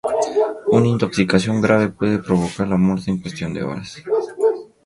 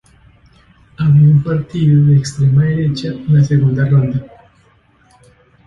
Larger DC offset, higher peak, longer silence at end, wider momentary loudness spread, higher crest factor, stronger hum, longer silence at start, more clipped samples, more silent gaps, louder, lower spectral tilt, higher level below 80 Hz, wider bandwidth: neither; about the same, 0 dBFS vs -2 dBFS; second, 0.2 s vs 1.4 s; about the same, 9 LU vs 9 LU; first, 18 dB vs 12 dB; neither; second, 0.05 s vs 1 s; neither; neither; second, -19 LUFS vs -13 LUFS; second, -6.5 dB/octave vs -8 dB/octave; second, -48 dBFS vs -42 dBFS; first, 11.5 kHz vs 7.8 kHz